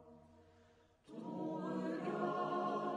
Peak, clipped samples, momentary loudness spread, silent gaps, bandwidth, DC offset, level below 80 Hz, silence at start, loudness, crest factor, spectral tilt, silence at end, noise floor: -26 dBFS; under 0.1%; 14 LU; none; 10.5 kHz; under 0.1%; -84 dBFS; 0 s; -41 LUFS; 16 dB; -7.5 dB/octave; 0 s; -69 dBFS